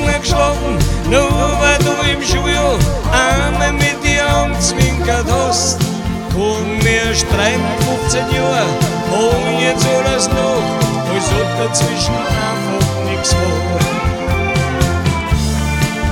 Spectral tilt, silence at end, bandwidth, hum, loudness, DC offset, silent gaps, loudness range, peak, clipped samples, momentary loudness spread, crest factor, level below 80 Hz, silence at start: -4.5 dB/octave; 0 s; 18 kHz; none; -14 LUFS; under 0.1%; none; 2 LU; 0 dBFS; under 0.1%; 4 LU; 14 dB; -24 dBFS; 0 s